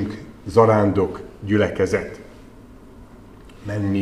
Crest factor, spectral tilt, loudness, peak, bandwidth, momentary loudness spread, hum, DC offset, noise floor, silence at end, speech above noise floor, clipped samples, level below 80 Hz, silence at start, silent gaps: 20 dB; -7.5 dB/octave; -20 LUFS; 0 dBFS; 12 kHz; 19 LU; none; 0.1%; -43 dBFS; 0 s; 25 dB; under 0.1%; -46 dBFS; 0 s; none